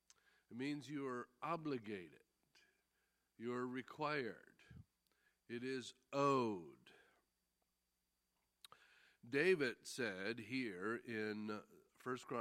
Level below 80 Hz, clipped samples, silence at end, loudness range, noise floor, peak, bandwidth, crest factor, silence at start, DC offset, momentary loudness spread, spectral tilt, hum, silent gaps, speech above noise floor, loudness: -86 dBFS; under 0.1%; 0 s; 6 LU; -88 dBFS; -24 dBFS; 15 kHz; 22 dB; 0.5 s; under 0.1%; 23 LU; -5 dB/octave; none; none; 45 dB; -44 LUFS